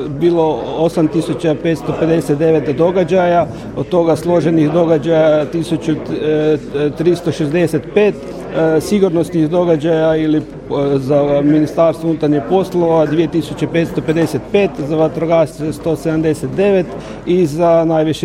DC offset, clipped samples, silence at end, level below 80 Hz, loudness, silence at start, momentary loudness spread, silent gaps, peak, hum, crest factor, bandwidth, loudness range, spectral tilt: under 0.1%; under 0.1%; 0 s; -42 dBFS; -14 LUFS; 0 s; 6 LU; none; 0 dBFS; none; 14 dB; 14.5 kHz; 2 LU; -7.5 dB/octave